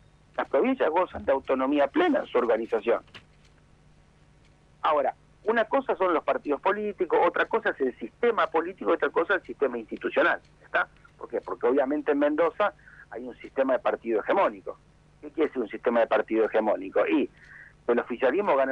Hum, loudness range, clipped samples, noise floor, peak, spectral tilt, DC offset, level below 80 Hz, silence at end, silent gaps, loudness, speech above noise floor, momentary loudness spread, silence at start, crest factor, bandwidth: 50 Hz at -60 dBFS; 3 LU; under 0.1%; -58 dBFS; -12 dBFS; -6.5 dB/octave; under 0.1%; -62 dBFS; 0 s; none; -26 LUFS; 32 dB; 10 LU; 0.4 s; 14 dB; 6.8 kHz